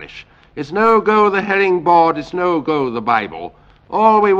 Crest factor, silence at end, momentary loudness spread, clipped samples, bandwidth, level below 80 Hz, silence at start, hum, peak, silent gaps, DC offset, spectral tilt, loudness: 14 dB; 0 s; 18 LU; under 0.1%; 7.6 kHz; -52 dBFS; 0 s; none; 0 dBFS; none; under 0.1%; -7 dB/octave; -15 LUFS